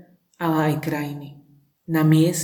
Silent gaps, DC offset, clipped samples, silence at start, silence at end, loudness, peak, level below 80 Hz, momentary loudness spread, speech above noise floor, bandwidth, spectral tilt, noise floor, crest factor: none; under 0.1%; under 0.1%; 0.4 s; 0 s; -22 LUFS; -6 dBFS; -64 dBFS; 17 LU; 35 dB; 19 kHz; -6 dB/octave; -55 dBFS; 16 dB